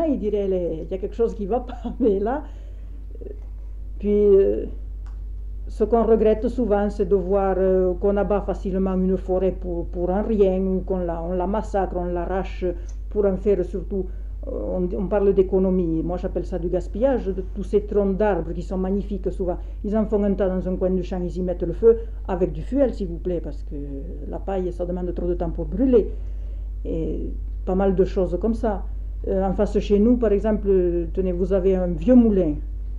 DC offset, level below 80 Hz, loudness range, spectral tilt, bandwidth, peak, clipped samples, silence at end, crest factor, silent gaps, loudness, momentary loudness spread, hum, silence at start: under 0.1%; -30 dBFS; 4 LU; -9.5 dB/octave; 7.4 kHz; -6 dBFS; under 0.1%; 0 s; 16 dB; none; -23 LUFS; 14 LU; none; 0 s